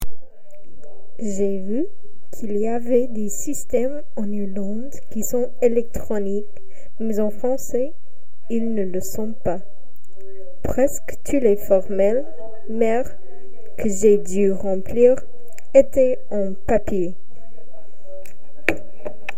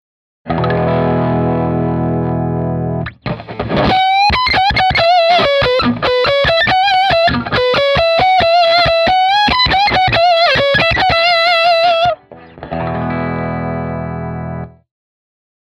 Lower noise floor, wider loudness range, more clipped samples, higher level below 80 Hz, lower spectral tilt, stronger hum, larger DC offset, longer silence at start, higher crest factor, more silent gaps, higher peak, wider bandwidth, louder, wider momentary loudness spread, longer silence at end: first, -52 dBFS vs -35 dBFS; about the same, 7 LU vs 6 LU; neither; second, -42 dBFS vs -34 dBFS; about the same, -6 dB/octave vs -6 dB/octave; neither; first, 10% vs under 0.1%; second, 0 s vs 0.45 s; first, 22 dB vs 14 dB; neither; about the same, 0 dBFS vs 0 dBFS; first, 16 kHz vs 11 kHz; second, -22 LUFS vs -12 LUFS; first, 16 LU vs 12 LU; second, 0.05 s vs 1.1 s